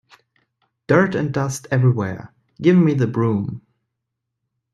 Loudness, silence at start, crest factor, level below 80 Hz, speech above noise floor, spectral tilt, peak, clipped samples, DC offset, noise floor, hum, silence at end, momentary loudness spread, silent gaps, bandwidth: -19 LUFS; 0.9 s; 18 dB; -58 dBFS; 62 dB; -7.5 dB/octave; -2 dBFS; under 0.1%; under 0.1%; -79 dBFS; none; 1.15 s; 13 LU; none; 12.5 kHz